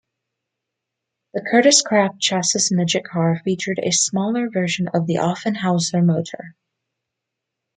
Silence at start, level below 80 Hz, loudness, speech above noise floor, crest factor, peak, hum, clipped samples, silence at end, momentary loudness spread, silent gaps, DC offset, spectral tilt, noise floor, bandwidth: 1.35 s; -66 dBFS; -18 LUFS; 63 dB; 20 dB; -2 dBFS; none; under 0.1%; 1.25 s; 9 LU; none; under 0.1%; -4 dB/octave; -82 dBFS; 9.6 kHz